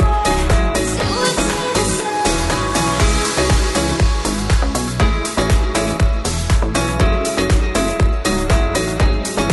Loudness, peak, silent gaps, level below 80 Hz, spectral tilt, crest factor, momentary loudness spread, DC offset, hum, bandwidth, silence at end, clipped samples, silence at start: -17 LUFS; -4 dBFS; none; -20 dBFS; -4.5 dB/octave; 12 dB; 2 LU; under 0.1%; none; 12 kHz; 0 s; under 0.1%; 0 s